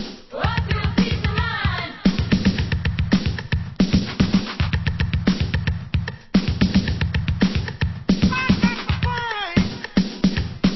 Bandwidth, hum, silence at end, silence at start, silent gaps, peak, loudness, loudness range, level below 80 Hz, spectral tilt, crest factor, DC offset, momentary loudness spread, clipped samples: 6 kHz; none; 0 s; 0 s; none; -2 dBFS; -22 LUFS; 1 LU; -28 dBFS; -6.5 dB/octave; 18 dB; under 0.1%; 5 LU; under 0.1%